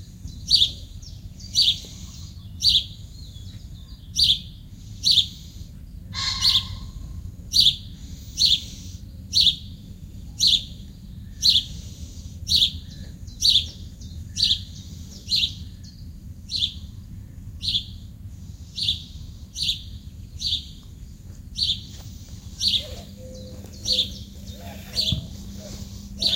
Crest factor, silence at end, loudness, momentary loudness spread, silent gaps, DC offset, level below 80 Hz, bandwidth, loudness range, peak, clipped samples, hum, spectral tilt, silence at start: 22 dB; 0 s; -21 LUFS; 24 LU; none; under 0.1%; -40 dBFS; 16 kHz; 7 LU; -4 dBFS; under 0.1%; none; -1.5 dB/octave; 0 s